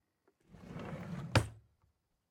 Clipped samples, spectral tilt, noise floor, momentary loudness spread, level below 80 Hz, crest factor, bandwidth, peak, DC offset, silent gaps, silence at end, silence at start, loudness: under 0.1%; -5.5 dB/octave; -77 dBFS; 17 LU; -58 dBFS; 30 dB; 16 kHz; -10 dBFS; under 0.1%; none; 0.7 s; 0.5 s; -38 LUFS